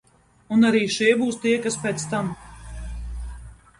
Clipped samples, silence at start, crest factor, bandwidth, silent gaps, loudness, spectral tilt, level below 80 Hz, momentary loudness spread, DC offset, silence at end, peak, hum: under 0.1%; 0.5 s; 18 dB; 11.5 kHz; none; -22 LUFS; -4.5 dB/octave; -40 dBFS; 20 LU; under 0.1%; 0.25 s; -6 dBFS; none